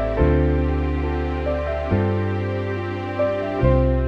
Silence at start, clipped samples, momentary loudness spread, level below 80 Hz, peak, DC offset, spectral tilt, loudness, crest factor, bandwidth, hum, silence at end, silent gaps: 0 s; under 0.1%; 7 LU; -26 dBFS; -4 dBFS; under 0.1%; -9.5 dB/octave; -22 LUFS; 16 dB; 5.8 kHz; none; 0 s; none